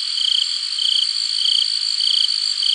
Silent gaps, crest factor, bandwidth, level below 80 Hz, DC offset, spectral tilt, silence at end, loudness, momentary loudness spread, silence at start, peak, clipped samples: none; 16 dB; 11.5 kHz; under -90 dBFS; under 0.1%; 8.5 dB/octave; 0 s; -16 LUFS; 3 LU; 0 s; -4 dBFS; under 0.1%